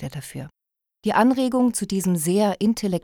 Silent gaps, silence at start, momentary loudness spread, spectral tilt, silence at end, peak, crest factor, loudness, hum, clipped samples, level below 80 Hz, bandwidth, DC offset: none; 0 s; 16 LU; -5.5 dB/octave; 0.05 s; -6 dBFS; 16 dB; -21 LUFS; none; under 0.1%; -56 dBFS; 19 kHz; under 0.1%